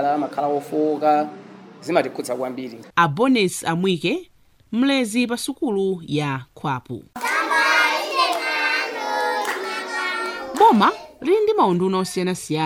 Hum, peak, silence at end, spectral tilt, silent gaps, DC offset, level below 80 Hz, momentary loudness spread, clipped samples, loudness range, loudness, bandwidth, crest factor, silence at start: none; -2 dBFS; 0 s; -4.5 dB/octave; none; under 0.1%; -64 dBFS; 11 LU; under 0.1%; 3 LU; -21 LUFS; 17 kHz; 18 dB; 0 s